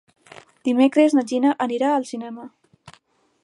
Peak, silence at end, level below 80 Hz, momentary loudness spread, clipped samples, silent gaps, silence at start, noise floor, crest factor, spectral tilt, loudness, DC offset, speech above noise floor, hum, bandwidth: -4 dBFS; 0.55 s; -74 dBFS; 16 LU; under 0.1%; none; 0.65 s; -57 dBFS; 18 dB; -4.5 dB/octave; -20 LUFS; under 0.1%; 37 dB; none; 11.5 kHz